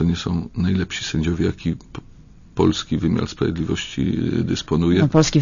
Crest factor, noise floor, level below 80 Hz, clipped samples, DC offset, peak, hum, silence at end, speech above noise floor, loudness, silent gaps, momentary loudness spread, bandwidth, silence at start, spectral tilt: 20 dB; -42 dBFS; -38 dBFS; under 0.1%; under 0.1%; -2 dBFS; none; 0 s; 22 dB; -21 LUFS; none; 11 LU; 7.4 kHz; 0 s; -6 dB/octave